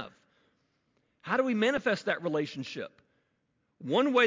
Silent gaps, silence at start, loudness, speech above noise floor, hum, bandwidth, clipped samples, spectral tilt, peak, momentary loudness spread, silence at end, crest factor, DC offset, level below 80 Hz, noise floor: none; 0 s; -30 LUFS; 48 dB; none; 7.6 kHz; under 0.1%; -5 dB/octave; -12 dBFS; 18 LU; 0 s; 20 dB; under 0.1%; -74 dBFS; -77 dBFS